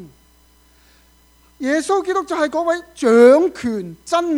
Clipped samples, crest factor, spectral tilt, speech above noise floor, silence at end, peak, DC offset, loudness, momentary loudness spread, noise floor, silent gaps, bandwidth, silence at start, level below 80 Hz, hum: under 0.1%; 16 dB; -4.5 dB/octave; 37 dB; 0 s; -2 dBFS; under 0.1%; -17 LUFS; 14 LU; -53 dBFS; none; 13 kHz; 0 s; -56 dBFS; none